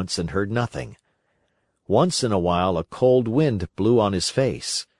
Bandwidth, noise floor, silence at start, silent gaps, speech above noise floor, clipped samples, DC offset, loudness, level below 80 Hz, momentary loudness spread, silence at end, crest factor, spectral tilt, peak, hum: 11.5 kHz; -70 dBFS; 0 s; none; 49 dB; under 0.1%; under 0.1%; -22 LUFS; -52 dBFS; 7 LU; 0.15 s; 18 dB; -5.5 dB/octave; -4 dBFS; none